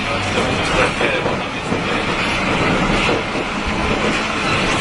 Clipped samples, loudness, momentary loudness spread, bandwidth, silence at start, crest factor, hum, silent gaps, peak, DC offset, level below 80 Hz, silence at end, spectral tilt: under 0.1%; -17 LUFS; 5 LU; 11 kHz; 0 s; 16 dB; none; none; -2 dBFS; under 0.1%; -32 dBFS; 0 s; -4.5 dB/octave